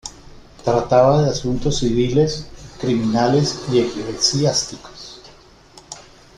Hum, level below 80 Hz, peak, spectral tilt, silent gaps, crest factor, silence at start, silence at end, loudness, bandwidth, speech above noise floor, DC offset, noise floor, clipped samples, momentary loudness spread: none; -40 dBFS; -2 dBFS; -5 dB/octave; none; 18 dB; 0.05 s; 0.35 s; -18 LUFS; 11.5 kHz; 29 dB; under 0.1%; -46 dBFS; under 0.1%; 22 LU